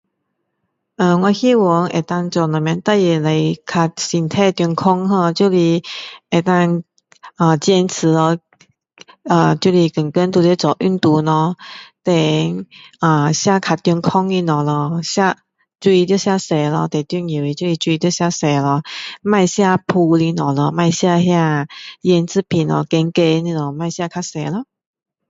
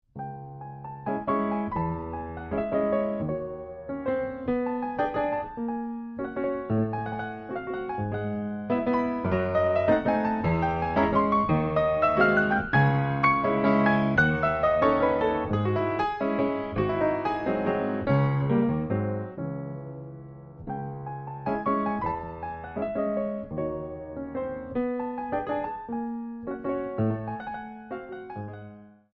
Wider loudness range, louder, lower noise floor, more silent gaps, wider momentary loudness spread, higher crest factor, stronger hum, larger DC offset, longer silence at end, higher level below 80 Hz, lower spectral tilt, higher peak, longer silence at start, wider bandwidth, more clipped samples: second, 2 LU vs 9 LU; first, -16 LUFS vs -27 LUFS; first, -72 dBFS vs -47 dBFS; neither; second, 9 LU vs 15 LU; about the same, 16 dB vs 18 dB; neither; neither; first, 0.65 s vs 0.25 s; second, -58 dBFS vs -50 dBFS; second, -6 dB/octave vs -9.5 dB/octave; first, 0 dBFS vs -8 dBFS; first, 1 s vs 0.15 s; first, 7.8 kHz vs 6.6 kHz; neither